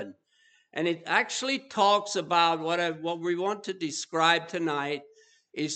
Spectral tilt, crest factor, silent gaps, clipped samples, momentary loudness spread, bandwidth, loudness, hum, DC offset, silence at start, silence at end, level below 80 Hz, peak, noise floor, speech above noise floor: -3 dB/octave; 22 dB; none; under 0.1%; 10 LU; 9.2 kHz; -27 LUFS; none; under 0.1%; 0 s; 0 s; -86 dBFS; -6 dBFS; -65 dBFS; 38 dB